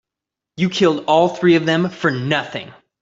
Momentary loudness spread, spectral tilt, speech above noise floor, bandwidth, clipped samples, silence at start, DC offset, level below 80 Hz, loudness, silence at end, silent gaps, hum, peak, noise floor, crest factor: 8 LU; -6 dB/octave; 68 dB; 7.8 kHz; under 0.1%; 0.6 s; under 0.1%; -60 dBFS; -17 LUFS; 0.3 s; none; none; -2 dBFS; -85 dBFS; 16 dB